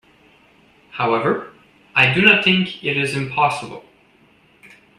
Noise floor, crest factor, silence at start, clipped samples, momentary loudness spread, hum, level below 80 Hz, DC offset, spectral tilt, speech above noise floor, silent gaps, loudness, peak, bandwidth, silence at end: -54 dBFS; 20 dB; 0.95 s; under 0.1%; 15 LU; none; -58 dBFS; under 0.1%; -5 dB/octave; 36 dB; none; -17 LUFS; 0 dBFS; 12 kHz; 1.2 s